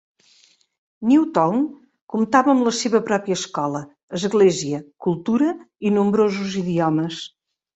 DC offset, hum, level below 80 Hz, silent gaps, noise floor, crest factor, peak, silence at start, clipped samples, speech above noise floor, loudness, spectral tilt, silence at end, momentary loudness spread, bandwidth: under 0.1%; none; -62 dBFS; 2.02-2.08 s, 4.03-4.08 s; -57 dBFS; 18 dB; -2 dBFS; 1 s; under 0.1%; 38 dB; -20 LUFS; -5.5 dB/octave; 0.5 s; 11 LU; 8.2 kHz